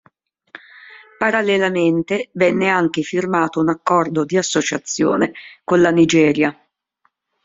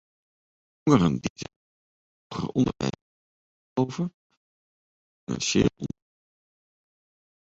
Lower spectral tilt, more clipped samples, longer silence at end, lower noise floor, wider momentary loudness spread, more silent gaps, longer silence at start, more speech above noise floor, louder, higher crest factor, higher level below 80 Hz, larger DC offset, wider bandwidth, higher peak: about the same, -5 dB/octave vs -5.5 dB/octave; neither; second, 0.9 s vs 1.6 s; second, -66 dBFS vs under -90 dBFS; second, 8 LU vs 18 LU; second, none vs 1.30-1.36 s, 1.56-2.30 s, 3.02-3.76 s, 4.14-4.30 s, 4.37-5.27 s; about the same, 0.9 s vs 0.85 s; second, 49 dB vs over 65 dB; first, -17 LUFS vs -26 LUFS; second, 16 dB vs 24 dB; second, -58 dBFS vs -52 dBFS; neither; about the same, 7.8 kHz vs 8 kHz; first, -2 dBFS vs -6 dBFS